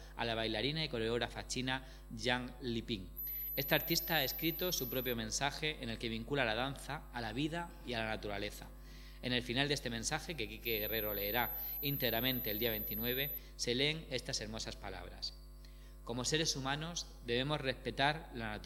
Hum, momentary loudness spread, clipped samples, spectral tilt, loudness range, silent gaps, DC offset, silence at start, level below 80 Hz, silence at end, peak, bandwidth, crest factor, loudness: none; 10 LU; under 0.1%; -3.5 dB/octave; 4 LU; none; under 0.1%; 0 s; -52 dBFS; 0 s; -14 dBFS; 19 kHz; 24 dB; -37 LUFS